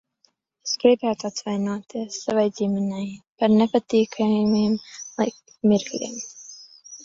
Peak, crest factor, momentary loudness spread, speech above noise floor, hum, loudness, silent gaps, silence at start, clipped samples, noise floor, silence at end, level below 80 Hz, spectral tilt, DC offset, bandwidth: -4 dBFS; 20 dB; 16 LU; 44 dB; none; -23 LUFS; 3.27-3.36 s; 0.65 s; under 0.1%; -66 dBFS; 0 s; -62 dBFS; -5.5 dB/octave; under 0.1%; 7.6 kHz